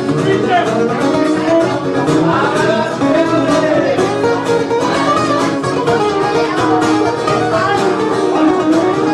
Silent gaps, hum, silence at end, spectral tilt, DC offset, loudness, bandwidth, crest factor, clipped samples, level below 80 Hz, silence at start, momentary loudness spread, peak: none; none; 0 s; -5.5 dB/octave; under 0.1%; -13 LUFS; 12 kHz; 12 dB; under 0.1%; -48 dBFS; 0 s; 2 LU; 0 dBFS